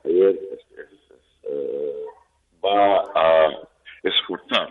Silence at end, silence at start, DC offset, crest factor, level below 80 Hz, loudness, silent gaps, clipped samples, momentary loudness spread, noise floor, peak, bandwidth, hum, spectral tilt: 0 s; 0.05 s; under 0.1%; 16 dB; -64 dBFS; -21 LUFS; none; under 0.1%; 20 LU; -58 dBFS; -6 dBFS; 6.8 kHz; none; -5 dB/octave